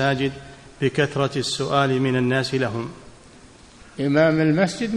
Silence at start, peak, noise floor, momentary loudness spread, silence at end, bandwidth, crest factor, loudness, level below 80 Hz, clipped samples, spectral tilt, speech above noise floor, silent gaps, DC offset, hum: 0 s; -6 dBFS; -47 dBFS; 11 LU; 0 s; 12 kHz; 16 dB; -21 LUFS; -52 dBFS; under 0.1%; -5.5 dB/octave; 26 dB; none; under 0.1%; none